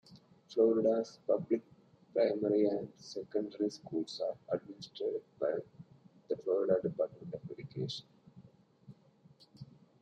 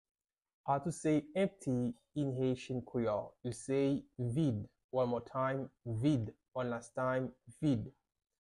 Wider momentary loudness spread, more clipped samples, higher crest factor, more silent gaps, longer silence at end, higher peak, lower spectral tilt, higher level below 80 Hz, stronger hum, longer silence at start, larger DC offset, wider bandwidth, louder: first, 15 LU vs 8 LU; neither; about the same, 20 dB vs 16 dB; second, none vs 4.84-4.89 s; second, 0.4 s vs 0.55 s; first, -16 dBFS vs -20 dBFS; about the same, -6.5 dB/octave vs -7.5 dB/octave; second, -78 dBFS vs -66 dBFS; neither; second, 0.1 s vs 0.65 s; neither; second, 8.6 kHz vs 12 kHz; about the same, -35 LUFS vs -37 LUFS